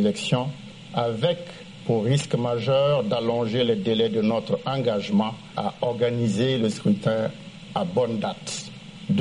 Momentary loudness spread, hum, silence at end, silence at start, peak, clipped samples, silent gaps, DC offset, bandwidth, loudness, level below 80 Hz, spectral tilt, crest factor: 10 LU; none; 0 s; 0 s; -8 dBFS; under 0.1%; none; under 0.1%; 11 kHz; -24 LUFS; -60 dBFS; -6 dB/octave; 16 dB